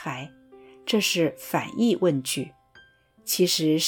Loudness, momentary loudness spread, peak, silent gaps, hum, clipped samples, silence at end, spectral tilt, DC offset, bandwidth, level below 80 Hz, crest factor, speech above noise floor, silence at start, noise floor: -24 LUFS; 16 LU; -10 dBFS; none; none; under 0.1%; 0 s; -4 dB/octave; under 0.1%; 19 kHz; -70 dBFS; 16 dB; 32 dB; 0 s; -56 dBFS